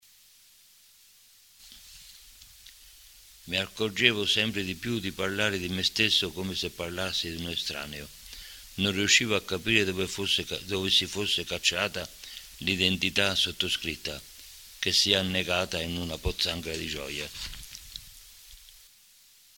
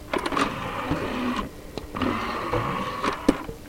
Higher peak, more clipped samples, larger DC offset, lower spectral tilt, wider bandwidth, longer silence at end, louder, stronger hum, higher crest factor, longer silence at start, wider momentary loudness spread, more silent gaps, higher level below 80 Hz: about the same, -2 dBFS vs -4 dBFS; neither; neither; second, -2.5 dB/octave vs -5.5 dB/octave; about the same, 17 kHz vs 16.5 kHz; first, 0.8 s vs 0 s; about the same, -27 LUFS vs -27 LUFS; neither; about the same, 28 dB vs 24 dB; first, 1.6 s vs 0 s; first, 20 LU vs 7 LU; neither; second, -52 dBFS vs -42 dBFS